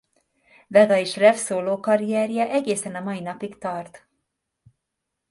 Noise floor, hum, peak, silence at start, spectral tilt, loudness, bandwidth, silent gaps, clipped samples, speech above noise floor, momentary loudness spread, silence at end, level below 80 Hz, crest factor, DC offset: -81 dBFS; none; -2 dBFS; 0.7 s; -4.5 dB/octave; -22 LUFS; 11.5 kHz; none; under 0.1%; 60 dB; 14 LU; 1.35 s; -70 dBFS; 20 dB; under 0.1%